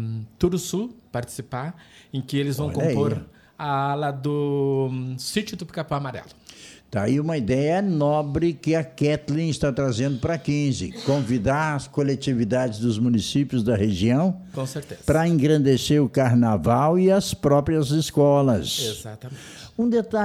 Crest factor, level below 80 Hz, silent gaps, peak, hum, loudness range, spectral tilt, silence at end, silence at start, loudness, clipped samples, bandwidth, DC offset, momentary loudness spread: 16 dB; -48 dBFS; none; -6 dBFS; none; 7 LU; -6.5 dB/octave; 0 s; 0 s; -23 LUFS; under 0.1%; 15.5 kHz; under 0.1%; 13 LU